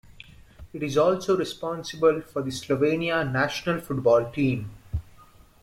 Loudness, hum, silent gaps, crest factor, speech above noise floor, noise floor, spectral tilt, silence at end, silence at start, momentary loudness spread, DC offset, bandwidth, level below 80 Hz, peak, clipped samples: -25 LUFS; none; none; 18 dB; 28 dB; -52 dBFS; -6 dB/octave; 0.6 s; 0.6 s; 13 LU; under 0.1%; 15.5 kHz; -48 dBFS; -8 dBFS; under 0.1%